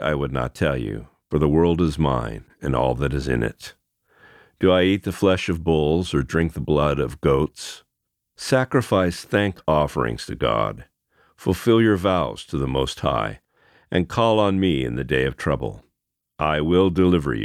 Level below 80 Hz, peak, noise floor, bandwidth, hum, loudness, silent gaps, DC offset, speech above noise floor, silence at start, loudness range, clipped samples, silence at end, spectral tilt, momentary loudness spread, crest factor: -38 dBFS; -4 dBFS; -79 dBFS; 15 kHz; none; -21 LUFS; none; under 0.1%; 58 dB; 0 s; 2 LU; under 0.1%; 0 s; -6.5 dB/octave; 10 LU; 18 dB